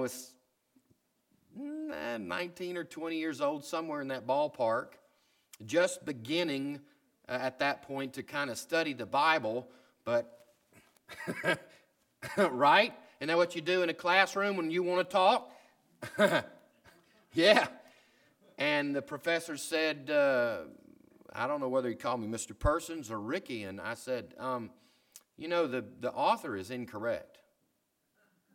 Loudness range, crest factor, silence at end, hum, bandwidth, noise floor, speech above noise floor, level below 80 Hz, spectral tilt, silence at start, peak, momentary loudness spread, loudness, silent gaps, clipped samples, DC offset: 7 LU; 24 dB; 1.3 s; none; 17 kHz; -78 dBFS; 47 dB; -58 dBFS; -4 dB/octave; 0 s; -10 dBFS; 14 LU; -32 LUFS; none; under 0.1%; under 0.1%